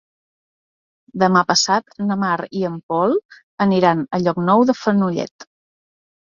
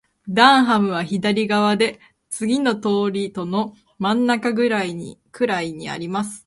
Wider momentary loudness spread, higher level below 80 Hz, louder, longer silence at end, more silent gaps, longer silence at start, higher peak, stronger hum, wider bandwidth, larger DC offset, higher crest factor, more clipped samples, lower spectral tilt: second, 9 LU vs 13 LU; about the same, -62 dBFS vs -62 dBFS; about the same, -18 LUFS vs -20 LUFS; first, 0.8 s vs 0.05 s; first, 2.83-2.89 s, 3.25-3.29 s, 3.43-3.58 s, 5.31-5.39 s vs none; first, 1.15 s vs 0.25 s; about the same, -2 dBFS vs 0 dBFS; neither; second, 7.6 kHz vs 11.5 kHz; neither; about the same, 18 dB vs 20 dB; neither; about the same, -5 dB/octave vs -5 dB/octave